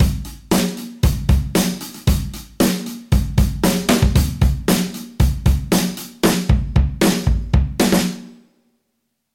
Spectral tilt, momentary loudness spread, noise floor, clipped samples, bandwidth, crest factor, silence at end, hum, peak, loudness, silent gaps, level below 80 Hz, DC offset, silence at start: -5.5 dB/octave; 7 LU; -72 dBFS; under 0.1%; 17 kHz; 14 dB; 1 s; none; -4 dBFS; -18 LUFS; none; -22 dBFS; under 0.1%; 0 s